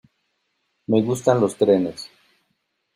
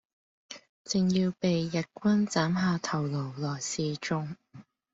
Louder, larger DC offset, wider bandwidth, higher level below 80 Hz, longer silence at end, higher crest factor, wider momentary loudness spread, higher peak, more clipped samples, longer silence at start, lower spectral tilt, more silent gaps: first, -20 LUFS vs -29 LUFS; neither; first, 15 kHz vs 8 kHz; about the same, -64 dBFS vs -66 dBFS; first, 0.9 s vs 0.3 s; about the same, 20 dB vs 16 dB; about the same, 20 LU vs 18 LU; first, -2 dBFS vs -14 dBFS; neither; first, 0.9 s vs 0.5 s; about the same, -6.5 dB/octave vs -5.5 dB/octave; second, none vs 0.69-0.85 s